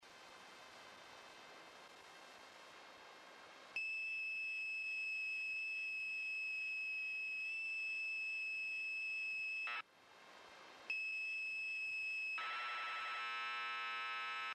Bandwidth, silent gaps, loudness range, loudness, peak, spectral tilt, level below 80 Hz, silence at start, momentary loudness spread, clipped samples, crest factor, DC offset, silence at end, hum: 13 kHz; none; 8 LU; -41 LUFS; -34 dBFS; 0.5 dB/octave; under -90 dBFS; 0 s; 17 LU; under 0.1%; 12 dB; under 0.1%; 0 s; none